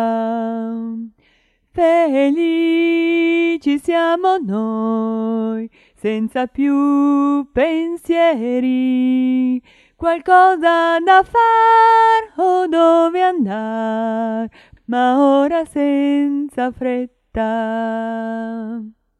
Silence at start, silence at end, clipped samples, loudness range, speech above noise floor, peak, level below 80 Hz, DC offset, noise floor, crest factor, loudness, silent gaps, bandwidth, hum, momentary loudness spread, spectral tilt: 0 s; 0.3 s; under 0.1%; 6 LU; 43 dB; 0 dBFS; -50 dBFS; under 0.1%; -59 dBFS; 16 dB; -16 LUFS; none; 12 kHz; none; 12 LU; -6 dB/octave